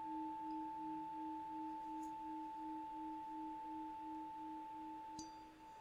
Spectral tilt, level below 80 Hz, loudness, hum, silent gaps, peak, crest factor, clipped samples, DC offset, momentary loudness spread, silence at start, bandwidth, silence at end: -4.5 dB/octave; -76 dBFS; -49 LUFS; none; none; -38 dBFS; 10 dB; under 0.1%; under 0.1%; 4 LU; 0 s; 15.5 kHz; 0 s